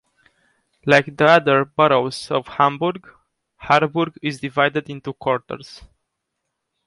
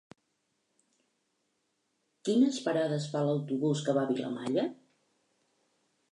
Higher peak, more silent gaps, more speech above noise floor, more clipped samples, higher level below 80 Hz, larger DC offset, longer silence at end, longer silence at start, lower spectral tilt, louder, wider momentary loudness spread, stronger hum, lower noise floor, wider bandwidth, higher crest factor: first, -2 dBFS vs -14 dBFS; neither; first, 59 dB vs 49 dB; neither; first, -58 dBFS vs -84 dBFS; neither; second, 1 s vs 1.4 s; second, 0.85 s vs 2.25 s; about the same, -5.5 dB/octave vs -6.5 dB/octave; first, -18 LUFS vs -31 LUFS; first, 15 LU vs 6 LU; neither; about the same, -78 dBFS vs -78 dBFS; about the same, 11.5 kHz vs 11 kHz; about the same, 20 dB vs 18 dB